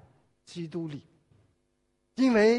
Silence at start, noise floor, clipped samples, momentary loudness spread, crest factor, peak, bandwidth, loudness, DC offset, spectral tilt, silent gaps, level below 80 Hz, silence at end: 0.5 s; -75 dBFS; under 0.1%; 21 LU; 18 dB; -12 dBFS; 11 kHz; -29 LUFS; under 0.1%; -6 dB/octave; none; -66 dBFS; 0 s